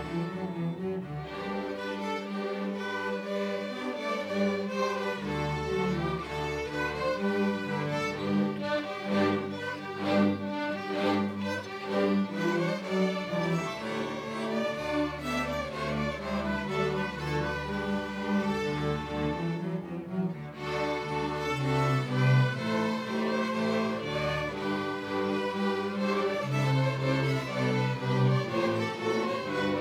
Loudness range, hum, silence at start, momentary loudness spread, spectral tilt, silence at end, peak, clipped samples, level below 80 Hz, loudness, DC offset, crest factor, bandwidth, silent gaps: 4 LU; none; 0 s; 6 LU; -6.5 dB/octave; 0 s; -14 dBFS; under 0.1%; -54 dBFS; -30 LUFS; under 0.1%; 16 dB; 15 kHz; none